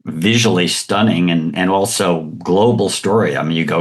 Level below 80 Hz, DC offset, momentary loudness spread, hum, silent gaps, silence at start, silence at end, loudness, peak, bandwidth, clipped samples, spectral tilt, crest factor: -54 dBFS; under 0.1%; 4 LU; none; none; 0.05 s; 0 s; -15 LUFS; -2 dBFS; 12.5 kHz; under 0.1%; -4.5 dB/octave; 14 dB